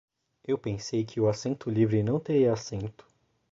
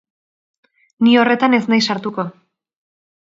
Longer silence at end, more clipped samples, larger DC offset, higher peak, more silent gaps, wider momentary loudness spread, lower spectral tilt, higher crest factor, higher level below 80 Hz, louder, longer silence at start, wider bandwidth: second, 0.6 s vs 1 s; neither; neither; second, -12 dBFS vs 0 dBFS; neither; about the same, 12 LU vs 13 LU; first, -7 dB/octave vs -5 dB/octave; about the same, 16 dB vs 18 dB; first, -58 dBFS vs -66 dBFS; second, -28 LUFS vs -15 LUFS; second, 0.5 s vs 1 s; about the same, 7.8 kHz vs 7.6 kHz